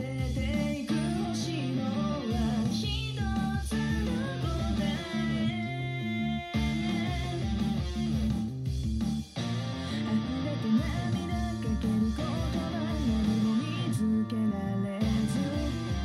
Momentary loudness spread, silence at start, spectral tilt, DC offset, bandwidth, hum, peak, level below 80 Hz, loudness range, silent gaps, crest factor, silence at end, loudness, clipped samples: 4 LU; 0 s; -6.5 dB/octave; under 0.1%; 13 kHz; none; -16 dBFS; -40 dBFS; 2 LU; none; 12 dB; 0 s; -31 LUFS; under 0.1%